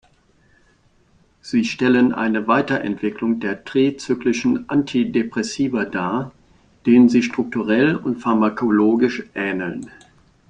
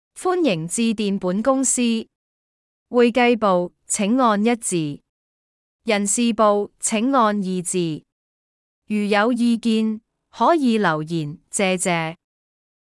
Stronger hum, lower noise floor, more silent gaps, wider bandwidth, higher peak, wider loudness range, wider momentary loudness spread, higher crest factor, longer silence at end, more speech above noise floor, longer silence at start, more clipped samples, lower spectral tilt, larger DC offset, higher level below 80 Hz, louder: neither; second, -57 dBFS vs under -90 dBFS; second, none vs 2.15-2.86 s, 5.09-5.79 s, 8.12-8.82 s; second, 9.2 kHz vs 12 kHz; about the same, -2 dBFS vs -4 dBFS; about the same, 3 LU vs 2 LU; about the same, 8 LU vs 10 LU; about the same, 16 dB vs 16 dB; second, 0.6 s vs 0.8 s; second, 39 dB vs over 71 dB; first, 1.45 s vs 0.15 s; neither; first, -6 dB/octave vs -4 dB/octave; neither; first, -56 dBFS vs -62 dBFS; about the same, -19 LUFS vs -20 LUFS